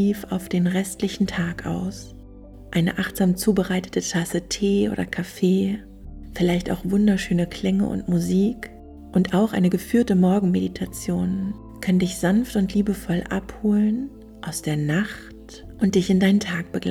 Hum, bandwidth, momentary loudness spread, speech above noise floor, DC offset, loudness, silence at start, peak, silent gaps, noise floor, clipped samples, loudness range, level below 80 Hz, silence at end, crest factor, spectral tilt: none; 15 kHz; 12 LU; 20 dB; under 0.1%; -23 LUFS; 0 s; -6 dBFS; none; -42 dBFS; under 0.1%; 3 LU; -44 dBFS; 0 s; 16 dB; -6 dB/octave